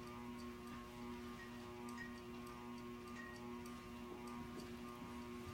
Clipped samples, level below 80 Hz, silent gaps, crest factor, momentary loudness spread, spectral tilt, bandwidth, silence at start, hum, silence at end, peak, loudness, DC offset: under 0.1%; -66 dBFS; none; 12 dB; 2 LU; -5 dB/octave; 16 kHz; 0 s; none; 0 s; -40 dBFS; -52 LUFS; under 0.1%